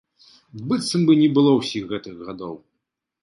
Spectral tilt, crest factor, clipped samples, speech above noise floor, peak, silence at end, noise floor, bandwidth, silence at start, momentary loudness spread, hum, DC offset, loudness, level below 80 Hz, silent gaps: -6 dB/octave; 18 dB; under 0.1%; 60 dB; -4 dBFS; 0.65 s; -80 dBFS; 11.5 kHz; 0.55 s; 19 LU; none; under 0.1%; -19 LUFS; -62 dBFS; none